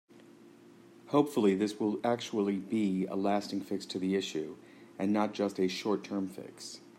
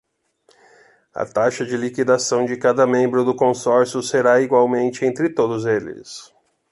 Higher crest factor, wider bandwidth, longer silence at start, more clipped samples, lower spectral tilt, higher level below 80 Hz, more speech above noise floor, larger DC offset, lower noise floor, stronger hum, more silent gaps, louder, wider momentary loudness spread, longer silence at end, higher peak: about the same, 20 dB vs 16 dB; first, 16 kHz vs 11.5 kHz; second, 0.15 s vs 1.15 s; neither; about the same, -6 dB/octave vs -5 dB/octave; second, -80 dBFS vs -64 dBFS; second, 25 dB vs 42 dB; neither; second, -56 dBFS vs -60 dBFS; neither; neither; second, -32 LUFS vs -18 LUFS; about the same, 13 LU vs 12 LU; second, 0.1 s vs 0.45 s; second, -14 dBFS vs -2 dBFS